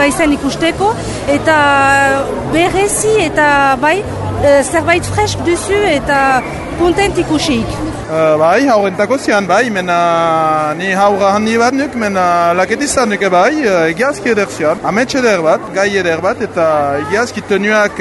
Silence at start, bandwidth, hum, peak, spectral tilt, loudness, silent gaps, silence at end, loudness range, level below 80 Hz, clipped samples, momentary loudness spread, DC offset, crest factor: 0 s; 12 kHz; none; 0 dBFS; -4.5 dB/octave; -12 LUFS; none; 0 s; 2 LU; -34 dBFS; under 0.1%; 5 LU; under 0.1%; 12 dB